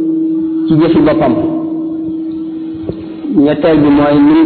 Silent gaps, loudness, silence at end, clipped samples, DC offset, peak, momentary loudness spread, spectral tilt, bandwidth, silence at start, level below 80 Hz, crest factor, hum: none; -12 LUFS; 0 s; under 0.1%; under 0.1%; 0 dBFS; 13 LU; -11.5 dB/octave; 4.5 kHz; 0 s; -40 dBFS; 10 dB; none